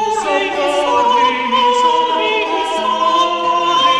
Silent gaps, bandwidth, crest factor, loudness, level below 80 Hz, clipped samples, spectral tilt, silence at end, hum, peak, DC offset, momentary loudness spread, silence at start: none; 11 kHz; 12 dB; -14 LUFS; -52 dBFS; under 0.1%; -2 dB/octave; 0 s; none; -2 dBFS; under 0.1%; 4 LU; 0 s